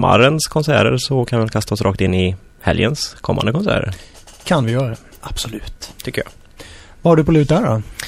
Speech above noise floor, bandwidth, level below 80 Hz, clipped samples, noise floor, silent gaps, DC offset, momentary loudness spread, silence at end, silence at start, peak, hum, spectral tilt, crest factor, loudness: 22 dB; 15.5 kHz; -36 dBFS; under 0.1%; -39 dBFS; none; under 0.1%; 16 LU; 0 s; 0 s; 0 dBFS; none; -5.5 dB/octave; 16 dB; -17 LUFS